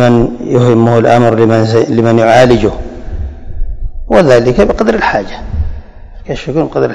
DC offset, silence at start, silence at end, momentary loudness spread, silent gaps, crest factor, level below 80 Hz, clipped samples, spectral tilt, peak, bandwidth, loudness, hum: 1%; 0 s; 0 s; 18 LU; none; 10 dB; -22 dBFS; 4%; -7 dB/octave; 0 dBFS; 11 kHz; -9 LUFS; none